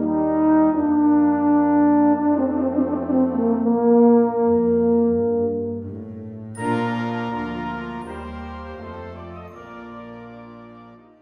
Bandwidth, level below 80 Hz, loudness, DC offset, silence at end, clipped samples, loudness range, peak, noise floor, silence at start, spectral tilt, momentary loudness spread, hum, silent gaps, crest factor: 10 kHz; -48 dBFS; -19 LUFS; under 0.1%; 0.25 s; under 0.1%; 15 LU; -6 dBFS; -45 dBFS; 0 s; -8.5 dB/octave; 20 LU; none; none; 14 dB